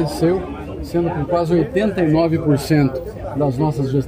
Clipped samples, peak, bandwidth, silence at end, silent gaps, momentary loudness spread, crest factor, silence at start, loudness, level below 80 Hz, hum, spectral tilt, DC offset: under 0.1%; -4 dBFS; 16 kHz; 0 s; none; 9 LU; 14 dB; 0 s; -18 LUFS; -38 dBFS; none; -7.5 dB/octave; under 0.1%